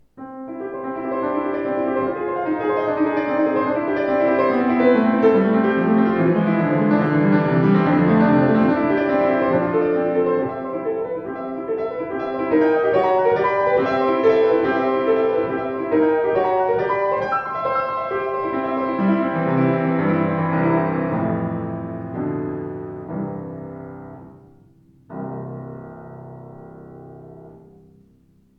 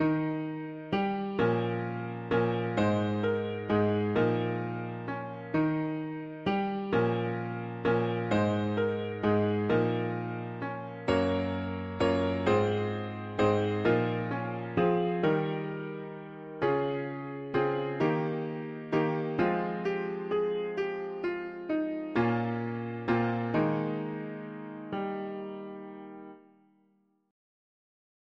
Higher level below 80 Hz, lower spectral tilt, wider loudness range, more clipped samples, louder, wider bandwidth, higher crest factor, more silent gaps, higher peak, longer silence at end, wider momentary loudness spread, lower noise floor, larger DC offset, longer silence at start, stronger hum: about the same, -56 dBFS vs -60 dBFS; first, -10 dB/octave vs -8 dB/octave; first, 16 LU vs 4 LU; neither; first, -19 LUFS vs -31 LUFS; second, 6 kHz vs 7.8 kHz; about the same, 16 dB vs 16 dB; neither; first, -4 dBFS vs -14 dBFS; second, 1 s vs 1.9 s; first, 16 LU vs 10 LU; second, -56 dBFS vs -70 dBFS; neither; first, 0.15 s vs 0 s; neither